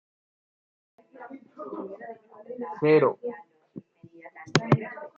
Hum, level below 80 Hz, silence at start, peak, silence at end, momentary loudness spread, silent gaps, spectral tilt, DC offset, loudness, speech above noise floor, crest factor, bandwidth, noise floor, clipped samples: none; -68 dBFS; 1.2 s; -2 dBFS; 0.1 s; 26 LU; none; -6 dB/octave; under 0.1%; -26 LUFS; 24 dB; 26 dB; 7.8 kHz; -50 dBFS; under 0.1%